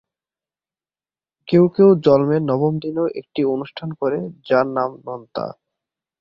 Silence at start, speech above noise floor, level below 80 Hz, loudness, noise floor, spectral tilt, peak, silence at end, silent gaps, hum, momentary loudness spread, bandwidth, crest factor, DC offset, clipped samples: 1.45 s; over 72 dB; -58 dBFS; -18 LUFS; under -90 dBFS; -10 dB/octave; -2 dBFS; 0.7 s; none; none; 16 LU; 5.8 kHz; 18 dB; under 0.1%; under 0.1%